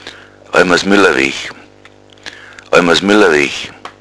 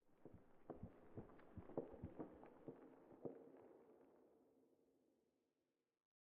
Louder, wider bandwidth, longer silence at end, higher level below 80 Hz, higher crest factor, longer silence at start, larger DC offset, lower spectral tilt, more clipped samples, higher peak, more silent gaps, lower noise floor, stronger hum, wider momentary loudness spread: first, -10 LUFS vs -60 LUFS; first, 11 kHz vs 3.5 kHz; second, 0.1 s vs 1.1 s; first, -46 dBFS vs -78 dBFS; second, 14 dB vs 26 dB; about the same, 0.05 s vs 0.05 s; neither; second, -4 dB/octave vs -7 dB/octave; first, 0.4% vs under 0.1%; first, 0 dBFS vs -34 dBFS; neither; second, -42 dBFS vs under -90 dBFS; first, 50 Hz at -40 dBFS vs none; first, 22 LU vs 14 LU